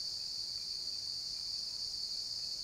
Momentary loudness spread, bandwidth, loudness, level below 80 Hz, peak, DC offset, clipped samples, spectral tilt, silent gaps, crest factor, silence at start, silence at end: 1 LU; 16 kHz; -37 LUFS; -68 dBFS; -28 dBFS; under 0.1%; under 0.1%; 0.5 dB/octave; none; 12 dB; 0 s; 0 s